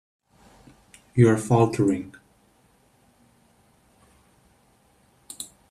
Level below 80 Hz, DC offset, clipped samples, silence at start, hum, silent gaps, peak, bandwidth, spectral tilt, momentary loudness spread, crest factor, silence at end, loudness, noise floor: -60 dBFS; under 0.1%; under 0.1%; 1.15 s; none; none; -4 dBFS; 14.5 kHz; -7.5 dB/octave; 21 LU; 22 dB; 0.25 s; -21 LUFS; -61 dBFS